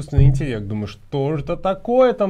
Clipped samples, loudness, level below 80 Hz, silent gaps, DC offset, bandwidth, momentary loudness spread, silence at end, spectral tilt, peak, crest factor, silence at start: under 0.1%; -20 LUFS; -26 dBFS; none; under 0.1%; 9.6 kHz; 11 LU; 0 s; -8.5 dB/octave; -2 dBFS; 16 dB; 0 s